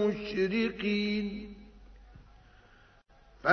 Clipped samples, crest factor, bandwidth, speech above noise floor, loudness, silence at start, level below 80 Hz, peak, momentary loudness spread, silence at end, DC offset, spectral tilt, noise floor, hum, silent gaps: under 0.1%; 22 dB; 6.6 kHz; 29 dB; -32 LUFS; 0 s; -56 dBFS; -10 dBFS; 16 LU; 0 s; under 0.1%; -6.5 dB/octave; -60 dBFS; none; none